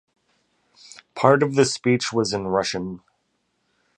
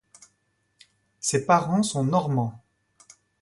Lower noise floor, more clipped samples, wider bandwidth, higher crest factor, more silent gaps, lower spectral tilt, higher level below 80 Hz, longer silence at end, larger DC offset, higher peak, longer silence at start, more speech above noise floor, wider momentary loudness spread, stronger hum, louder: about the same, -71 dBFS vs -72 dBFS; neither; about the same, 11 kHz vs 11.5 kHz; about the same, 22 dB vs 20 dB; neither; about the same, -4.5 dB/octave vs -5.5 dB/octave; first, -58 dBFS vs -64 dBFS; first, 1 s vs 0.85 s; neither; first, -2 dBFS vs -6 dBFS; about the same, 1.15 s vs 1.25 s; about the same, 51 dB vs 49 dB; first, 16 LU vs 8 LU; neither; first, -21 LUFS vs -24 LUFS